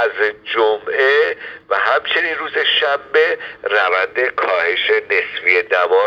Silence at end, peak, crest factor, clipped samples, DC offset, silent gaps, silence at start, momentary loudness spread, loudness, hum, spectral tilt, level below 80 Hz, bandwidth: 0 s; 0 dBFS; 16 dB; under 0.1%; under 0.1%; none; 0 s; 5 LU; -16 LUFS; none; -3 dB/octave; -62 dBFS; 7 kHz